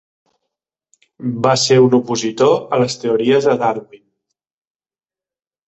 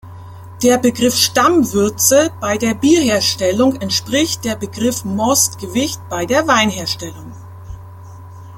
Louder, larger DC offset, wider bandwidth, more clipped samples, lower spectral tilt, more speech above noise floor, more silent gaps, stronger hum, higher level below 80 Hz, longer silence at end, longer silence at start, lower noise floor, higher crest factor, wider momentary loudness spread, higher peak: about the same, -15 LUFS vs -15 LUFS; neither; second, 8.2 kHz vs 17 kHz; neither; first, -5 dB/octave vs -3 dB/octave; first, over 75 dB vs 19 dB; neither; neither; second, -58 dBFS vs -48 dBFS; first, 1.7 s vs 0 s; first, 1.2 s vs 0.05 s; first, under -90 dBFS vs -34 dBFS; about the same, 16 dB vs 16 dB; second, 10 LU vs 22 LU; about the same, -2 dBFS vs 0 dBFS